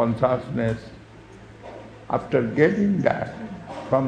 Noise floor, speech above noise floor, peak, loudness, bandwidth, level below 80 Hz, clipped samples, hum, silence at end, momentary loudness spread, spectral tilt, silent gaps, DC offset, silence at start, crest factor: -45 dBFS; 22 dB; -4 dBFS; -23 LUFS; 9.4 kHz; -50 dBFS; under 0.1%; none; 0 s; 22 LU; -8.5 dB/octave; none; under 0.1%; 0 s; 20 dB